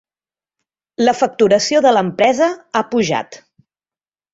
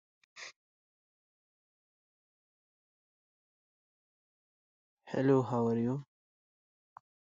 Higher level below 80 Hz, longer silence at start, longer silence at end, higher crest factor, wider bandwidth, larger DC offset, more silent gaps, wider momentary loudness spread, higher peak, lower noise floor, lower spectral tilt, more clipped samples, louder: first, -58 dBFS vs -78 dBFS; first, 1 s vs 0.35 s; second, 0.95 s vs 1.2 s; second, 16 dB vs 24 dB; about the same, 8 kHz vs 7.4 kHz; neither; second, none vs 0.56-4.97 s; second, 9 LU vs 20 LU; first, -2 dBFS vs -16 dBFS; about the same, under -90 dBFS vs under -90 dBFS; second, -4 dB/octave vs -7.5 dB/octave; neither; first, -15 LUFS vs -32 LUFS